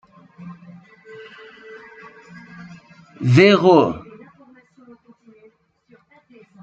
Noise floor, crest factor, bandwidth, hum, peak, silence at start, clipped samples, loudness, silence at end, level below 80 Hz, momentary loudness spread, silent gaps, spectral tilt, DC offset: -56 dBFS; 20 dB; 8 kHz; none; -2 dBFS; 0.45 s; under 0.1%; -14 LUFS; 2.65 s; -60 dBFS; 29 LU; none; -7 dB/octave; under 0.1%